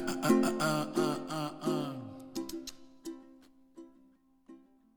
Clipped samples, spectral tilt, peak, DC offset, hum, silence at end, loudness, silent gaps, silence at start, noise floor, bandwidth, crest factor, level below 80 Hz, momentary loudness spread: under 0.1%; -5 dB/octave; -14 dBFS; under 0.1%; none; 0.4 s; -33 LUFS; none; 0 s; -65 dBFS; over 20 kHz; 22 dB; -66 dBFS; 22 LU